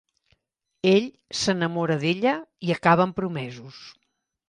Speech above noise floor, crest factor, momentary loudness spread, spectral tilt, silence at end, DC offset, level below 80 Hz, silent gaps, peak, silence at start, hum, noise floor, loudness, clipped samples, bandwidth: 52 dB; 20 dB; 16 LU; -5.5 dB/octave; 0.55 s; under 0.1%; -62 dBFS; none; -4 dBFS; 0.85 s; none; -76 dBFS; -24 LUFS; under 0.1%; 11 kHz